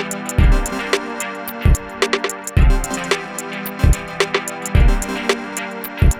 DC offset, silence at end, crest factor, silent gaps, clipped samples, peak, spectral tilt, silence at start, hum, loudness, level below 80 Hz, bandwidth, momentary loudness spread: under 0.1%; 0 s; 16 dB; none; under 0.1%; 0 dBFS; -4.5 dB/octave; 0 s; none; -19 LUFS; -20 dBFS; 17 kHz; 8 LU